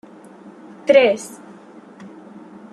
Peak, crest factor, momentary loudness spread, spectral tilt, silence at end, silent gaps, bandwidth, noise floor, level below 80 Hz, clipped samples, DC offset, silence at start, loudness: -2 dBFS; 20 dB; 27 LU; -3.5 dB/octave; 0.65 s; none; 12.5 kHz; -42 dBFS; -70 dBFS; under 0.1%; under 0.1%; 0.85 s; -16 LUFS